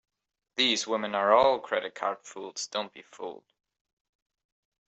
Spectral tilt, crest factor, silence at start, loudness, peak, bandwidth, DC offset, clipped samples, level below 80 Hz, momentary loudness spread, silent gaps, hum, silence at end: -2 dB/octave; 24 dB; 0.55 s; -27 LUFS; -8 dBFS; 8.2 kHz; under 0.1%; under 0.1%; -70 dBFS; 19 LU; none; none; 1.5 s